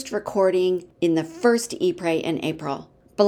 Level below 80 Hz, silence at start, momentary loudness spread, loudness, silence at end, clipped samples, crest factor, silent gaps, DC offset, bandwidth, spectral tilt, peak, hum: -62 dBFS; 0 s; 10 LU; -23 LUFS; 0 s; under 0.1%; 18 dB; none; under 0.1%; 15 kHz; -5 dB/octave; -4 dBFS; none